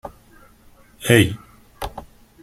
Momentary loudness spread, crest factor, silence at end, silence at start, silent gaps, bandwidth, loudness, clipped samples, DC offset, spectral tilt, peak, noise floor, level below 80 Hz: 24 LU; 22 dB; 0.4 s; 0.05 s; none; 16 kHz; -18 LUFS; under 0.1%; under 0.1%; -5 dB/octave; -2 dBFS; -50 dBFS; -46 dBFS